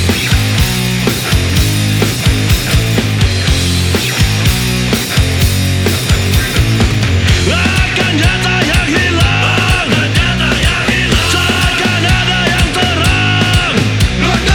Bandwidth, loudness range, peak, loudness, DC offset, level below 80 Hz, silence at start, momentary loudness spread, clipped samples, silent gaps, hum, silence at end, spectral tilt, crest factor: over 20 kHz; 1 LU; 0 dBFS; -11 LUFS; under 0.1%; -20 dBFS; 0 s; 2 LU; under 0.1%; none; none; 0 s; -4 dB/octave; 10 dB